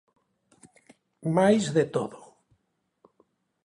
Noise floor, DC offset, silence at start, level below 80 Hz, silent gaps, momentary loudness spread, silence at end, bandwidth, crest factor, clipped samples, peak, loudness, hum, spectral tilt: -76 dBFS; under 0.1%; 1.25 s; -68 dBFS; none; 14 LU; 1.5 s; 11.5 kHz; 20 dB; under 0.1%; -10 dBFS; -25 LUFS; none; -6 dB/octave